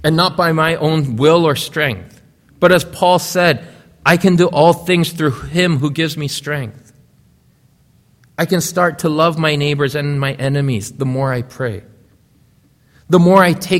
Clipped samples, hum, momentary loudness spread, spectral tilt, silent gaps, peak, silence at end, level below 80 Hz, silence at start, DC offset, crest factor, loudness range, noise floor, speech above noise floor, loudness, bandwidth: under 0.1%; none; 10 LU; -5.5 dB/octave; none; 0 dBFS; 0 s; -48 dBFS; 0 s; under 0.1%; 16 dB; 7 LU; -53 dBFS; 39 dB; -15 LUFS; 16 kHz